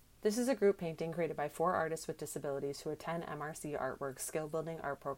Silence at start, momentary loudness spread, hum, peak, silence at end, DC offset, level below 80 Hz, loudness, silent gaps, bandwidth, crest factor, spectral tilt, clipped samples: 0.2 s; 9 LU; none; -20 dBFS; 0 s; under 0.1%; -66 dBFS; -38 LUFS; none; 16.5 kHz; 18 dB; -5 dB/octave; under 0.1%